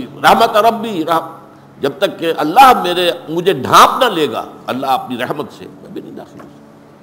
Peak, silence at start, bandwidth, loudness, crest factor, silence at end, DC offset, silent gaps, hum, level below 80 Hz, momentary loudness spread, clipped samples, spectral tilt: 0 dBFS; 0 s; 16.5 kHz; -13 LUFS; 14 dB; 0.55 s; under 0.1%; none; none; -50 dBFS; 22 LU; under 0.1%; -4 dB/octave